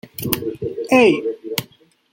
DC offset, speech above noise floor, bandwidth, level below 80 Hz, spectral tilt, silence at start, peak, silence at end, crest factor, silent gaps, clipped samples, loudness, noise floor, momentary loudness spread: under 0.1%; 33 dB; 17 kHz; -54 dBFS; -4.5 dB/octave; 0.05 s; 0 dBFS; 0.45 s; 20 dB; none; under 0.1%; -19 LUFS; -50 dBFS; 13 LU